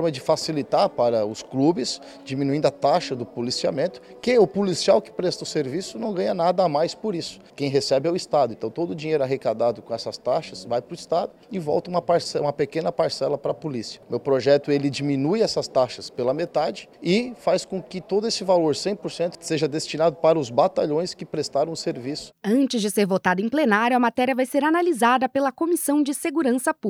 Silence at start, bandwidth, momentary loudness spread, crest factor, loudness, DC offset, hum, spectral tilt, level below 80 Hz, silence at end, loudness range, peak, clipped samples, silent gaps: 0 s; 17.5 kHz; 9 LU; 18 dB; -23 LUFS; under 0.1%; none; -5 dB/octave; -64 dBFS; 0 s; 4 LU; -4 dBFS; under 0.1%; none